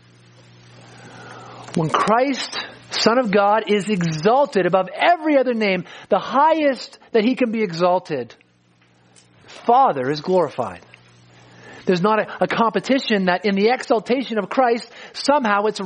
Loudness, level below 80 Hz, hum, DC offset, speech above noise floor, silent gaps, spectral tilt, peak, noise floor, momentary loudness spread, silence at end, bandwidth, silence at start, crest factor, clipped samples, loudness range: -19 LUFS; -66 dBFS; none; under 0.1%; 39 dB; none; -5.5 dB/octave; -2 dBFS; -57 dBFS; 12 LU; 0 s; 10 kHz; 1 s; 18 dB; under 0.1%; 4 LU